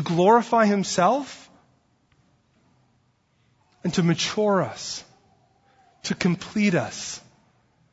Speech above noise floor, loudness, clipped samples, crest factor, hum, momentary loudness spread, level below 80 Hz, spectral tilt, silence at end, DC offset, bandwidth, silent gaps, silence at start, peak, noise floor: 44 dB; -23 LUFS; under 0.1%; 20 dB; none; 17 LU; -64 dBFS; -5 dB/octave; 0.75 s; under 0.1%; 8 kHz; none; 0 s; -6 dBFS; -66 dBFS